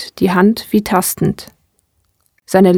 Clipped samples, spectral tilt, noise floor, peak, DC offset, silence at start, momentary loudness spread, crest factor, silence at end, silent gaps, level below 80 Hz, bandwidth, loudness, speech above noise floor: under 0.1%; -5.5 dB/octave; -63 dBFS; 0 dBFS; under 0.1%; 0 s; 7 LU; 14 dB; 0 s; none; -46 dBFS; 18.5 kHz; -14 LUFS; 48 dB